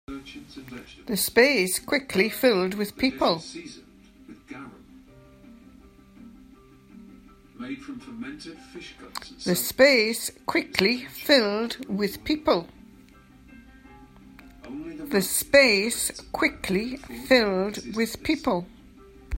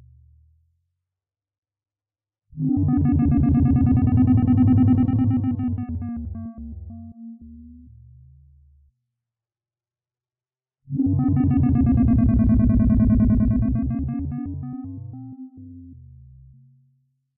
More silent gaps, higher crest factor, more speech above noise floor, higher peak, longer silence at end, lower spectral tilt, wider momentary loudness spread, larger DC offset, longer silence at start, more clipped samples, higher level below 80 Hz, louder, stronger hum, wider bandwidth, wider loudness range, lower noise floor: neither; first, 26 dB vs 14 dB; second, 27 dB vs over 72 dB; first, -2 dBFS vs -8 dBFS; second, 0 s vs 1.45 s; second, -3.5 dB/octave vs -14 dB/octave; about the same, 23 LU vs 21 LU; neither; second, 0.1 s vs 2.55 s; neither; second, -50 dBFS vs -32 dBFS; second, -23 LUFS vs -20 LUFS; neither; first, 16.5 kHz vs 3 kHz; first, 19 LU vs 15 LU; second, -52 dBFS vs under -90 dBFS